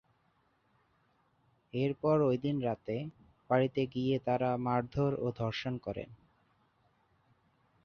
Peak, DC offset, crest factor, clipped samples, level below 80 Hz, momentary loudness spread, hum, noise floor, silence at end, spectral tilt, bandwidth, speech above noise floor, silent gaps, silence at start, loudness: -16 dBFS; under 0.1%; 20 dB; under 0.1%; -64 dBFS; 11 LU; none; -73 dBFS; 1.7 s; -8.5 dB/octave; 6.8 kHz; 41 dB; none; 1.75 s; -33 LUFS